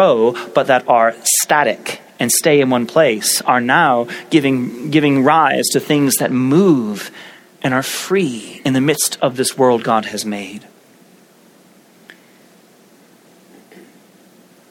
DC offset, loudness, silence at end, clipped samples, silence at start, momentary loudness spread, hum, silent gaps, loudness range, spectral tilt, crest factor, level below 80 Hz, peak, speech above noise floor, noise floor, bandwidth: under 0.1%; -15 LUFS; 0.9 s; under 0.1%; 0 s; 11 LU; none; none; 7 LU; -4 dB/octave; 16 dB; -64 dBFS; 0 dBFS; 33 dB; -48 dBFS; 17.5 kHz